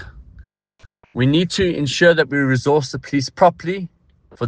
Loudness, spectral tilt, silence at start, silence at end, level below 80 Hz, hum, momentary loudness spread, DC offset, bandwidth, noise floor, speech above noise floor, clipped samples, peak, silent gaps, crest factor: -17 LUFS; -5.5 dB/octave; 0 s; 0 s; -46 dBFS; none; 12 LU; under 0.1%; 9.8 kHz; -52 dBFS; 35 dB; under 0.1%; 0 dBFS; none; 18 dB